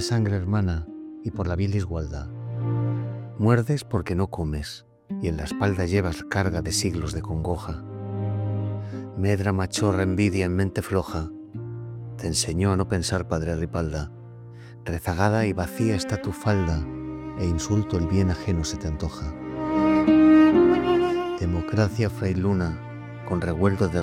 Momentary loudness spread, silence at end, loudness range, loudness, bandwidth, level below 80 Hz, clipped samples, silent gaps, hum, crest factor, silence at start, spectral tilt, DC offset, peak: 13 LU; 0 s; 7 LU; -25 LUFS; 15 kHz; -42 dBFS; under 0.1%; none; none; 18 dB; 0 s; -6 dB/octave; under 0.1%; -6 dBFS